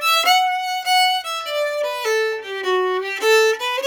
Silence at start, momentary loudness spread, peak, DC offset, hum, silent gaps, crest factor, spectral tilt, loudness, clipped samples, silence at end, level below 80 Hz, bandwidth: 0 s; 7 LU; -4 dBFS; under 0.1%; none; none; 14 dB; 1 dB/octave; -18 LUFS; under 0.1%; 0 s; -72 dBFS; 19 kHz